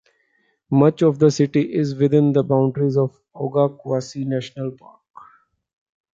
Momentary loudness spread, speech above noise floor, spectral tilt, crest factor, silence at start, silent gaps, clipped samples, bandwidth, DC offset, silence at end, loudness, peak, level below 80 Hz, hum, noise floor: 10 LU; 47 dB; -8 dB/octave; 18 dB; 0.7 s; none; under 0.1%; 7.6 kHz; under 0.1%; 1.4 s; -19 LUFS; -2 dBFS; -64 dBFS; none; -65 dBFS